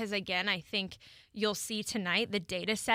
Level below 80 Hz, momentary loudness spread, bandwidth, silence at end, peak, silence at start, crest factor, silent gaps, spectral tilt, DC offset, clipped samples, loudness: -66 dBFS; 8 LU; 16 kHz; 0 s; -14 dBFS; 0 s; 20 dB; none; -3 dB/octave; under 0.1%; under 0.1%; -33 LUFS